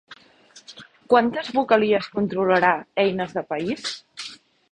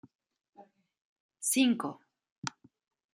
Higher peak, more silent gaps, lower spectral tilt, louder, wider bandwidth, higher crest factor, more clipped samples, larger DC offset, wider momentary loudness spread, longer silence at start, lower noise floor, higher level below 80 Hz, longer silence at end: first, -2 dBFS vs -14 dBFS; second, none vs 1.05-1.29 s, 2.32-2.42 s; first, -5 dB/octave vs -2.5 dB/octave; first, -22 LUFS vs -31 LUFS; second, 10.5 kHz vs 16 kHz; about the same, 22 dB vs 22 dB; neither; neither; about the same, 17 LU vs 15 LU; second, 0.1 s vs 0.6 s; second, -52 dBFS vs -60 dBFS; first, -62 dBFS vs -86 dBFS; second, 0.35 s vs 0.65 s